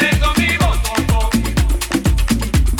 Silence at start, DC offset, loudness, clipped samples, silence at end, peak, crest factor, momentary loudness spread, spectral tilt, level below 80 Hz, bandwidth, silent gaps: 0 s; under 0.1%; -16 LUFS; under 0.1%; 0 s; -6 dBFS; 10 dB; 3 LU; -4.5 dB/octave; -18 dBFS; 17 kHz; none